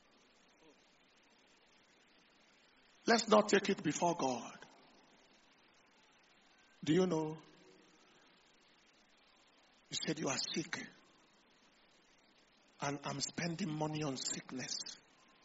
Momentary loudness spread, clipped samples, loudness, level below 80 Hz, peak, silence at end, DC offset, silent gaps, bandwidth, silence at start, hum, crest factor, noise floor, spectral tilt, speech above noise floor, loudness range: 16 LU; under 0.1%; -37 LUFS; -80 dBFS; -14 dBFS; 0.45 s; under 0.1%; none; 8 kHz; 3.05 s; none; 26 dB; -69 dBFS; -3.5 dB/octave; 33 dB; 8 LU